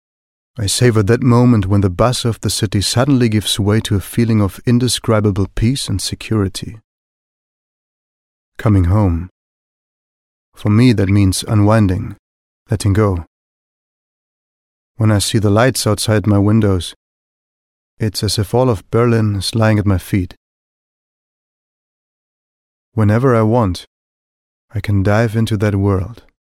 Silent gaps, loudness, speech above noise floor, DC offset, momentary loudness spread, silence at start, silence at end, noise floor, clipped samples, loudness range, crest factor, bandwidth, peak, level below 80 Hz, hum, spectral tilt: 6.84-8.52 s, 9.31-10.52 s, 12.19-12.66 s, 13.27-14.95 s, 16.96-17.97 s, 20.37-22.92 s, 23.87-24.68 s; -15 LUFS; over 76 dB; under 0.1%; 11 LU; 0.55 s; 0.3 s; under -90 dBFS; under 0.1%; 6 LU; 16 dB; 15 kHz; 0 dBFS; -38 dBFS; none; -6 dB/octave